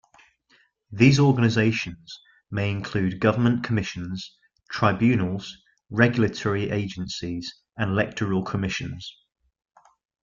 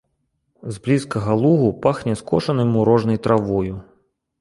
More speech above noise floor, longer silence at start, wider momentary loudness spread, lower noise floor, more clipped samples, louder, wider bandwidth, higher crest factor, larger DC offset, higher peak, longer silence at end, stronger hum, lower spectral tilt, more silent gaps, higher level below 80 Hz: second, 40 dB vs 52 dB; first, 0.9 s vs 0.65 s; first, 17 LU vs 12 LU; second, -63 dBFS vs -70 dBFS; neither; second, -24 LUFS vs -19 LUFS; second, 7.6 kHz vs 11.5 kHz; about the same, 22 dB vs 18 dB; neither; about the same, -4 dBFS vs -2 dBFS; first, 1.1 s vs 0.6 s; neither; second, -6.5 dB/octave vs -8 dB/octave; neither; second, -54 dBFS vs -48 dBFS